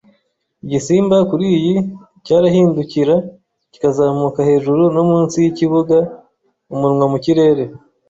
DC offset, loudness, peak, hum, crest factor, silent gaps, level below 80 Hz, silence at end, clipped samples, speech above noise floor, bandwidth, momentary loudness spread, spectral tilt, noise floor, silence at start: under 0.1%; -15 LUFS; -2 dBFS; none; 14 dB; none; -54 dBFS; 0.3 s; under 0.1%; 50 dB; 8 kHz; 9 LU; -7.5 dB/octave; -64 dBFS; 0.65 s